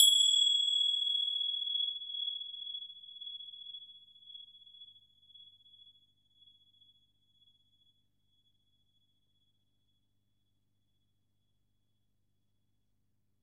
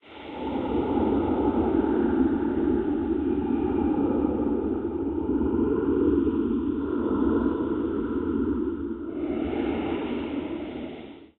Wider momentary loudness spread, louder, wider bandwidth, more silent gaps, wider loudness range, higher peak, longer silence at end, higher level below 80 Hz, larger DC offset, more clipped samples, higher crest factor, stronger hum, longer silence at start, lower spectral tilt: first, 26 LU vs 8 LU; second, -29 LUFS vs -26 LUFS; first, 13.5 kHz vs 4.1 kHz; neither; first, 26 LU vs 4 LU; about the same, -10 dBFS vs -12 dBFS; first, 8.55 s vs 0.15 s; second, -90 dBFS vs -42 dBFS; neither; neither; first, 28 dB vs 14 dB; first, 50 Hz at -85 dBFS vs none; about the same, 0 s vs 0.05 s; second, 4.5 dB/octave vs -11 dB/octave